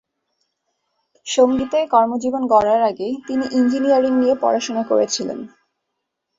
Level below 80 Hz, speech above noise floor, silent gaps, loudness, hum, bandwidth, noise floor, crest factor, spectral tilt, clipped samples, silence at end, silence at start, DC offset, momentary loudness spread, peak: -58 dBFS; 60 dB; none; -18 LUFS; none; 7.8 kHz; -77 dBFS; 18 dB; -4 dB/octave; under 0.1%; 0.9 s; 1.25 s; under 0.1%; 9 LU; -2 dBFS